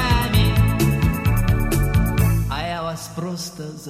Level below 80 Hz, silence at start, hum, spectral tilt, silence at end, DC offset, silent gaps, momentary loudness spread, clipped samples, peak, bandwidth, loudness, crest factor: -26 dBFS; 0 s; none; -6 dB/octave; 0 s; under 0.1%; none; 11 LU; under 0.1%; -4 dBFS; 16 kHz; -20 LUFS; 16 dB